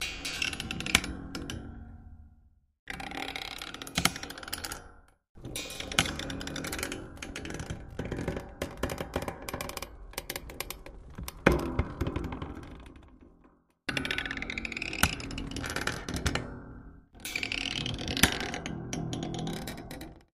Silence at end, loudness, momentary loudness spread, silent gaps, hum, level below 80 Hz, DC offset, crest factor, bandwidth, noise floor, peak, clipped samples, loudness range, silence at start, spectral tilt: 0.1 s; -33 LUFS; 16 LU; 2.79-2.87 s, 5.29-5.35 s; none; -46 dBFS; under 0.1%; 34 dB; 15.5 kHz; -63 dBFS; -2 dBFS; under 0.1%; 5 LU; 0 s; -3 dB/octave